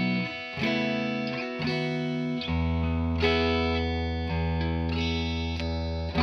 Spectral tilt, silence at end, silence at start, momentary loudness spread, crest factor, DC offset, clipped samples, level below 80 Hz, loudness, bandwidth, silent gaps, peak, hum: -7 dB/octave; 0 s; 0 s; 6 LU; 16 dB; under 0.1%; under 0.1%; -36 dBFS; -28 LUFS; 6.6 kHz; none; -12 dBFS; none